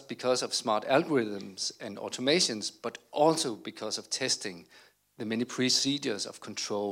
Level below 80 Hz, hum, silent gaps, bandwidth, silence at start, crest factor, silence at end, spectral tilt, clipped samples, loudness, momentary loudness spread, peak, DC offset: -82 dBFS; none; none; 16.5 kHz; 0 s; 20 dB; 0 s; -3 dB/octave; under 0.1%; -30 LUFS; 12 LU; -10 dBFS; under 0.1%